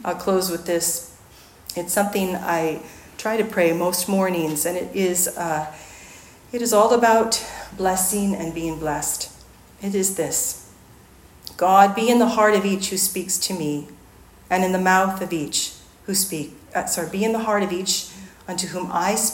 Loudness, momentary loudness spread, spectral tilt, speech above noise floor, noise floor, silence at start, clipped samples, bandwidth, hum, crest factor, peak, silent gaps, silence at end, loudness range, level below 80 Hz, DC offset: -21 LUFS; 16 LU; -3.5 dB/octave; 27 dB; -48 dBFS; 0 s; under 0.1%; 16.5 kHz; none; 22 dB; 0 dBFS; none; 0 s; 4 LU; -54 dBFS; under 0.1%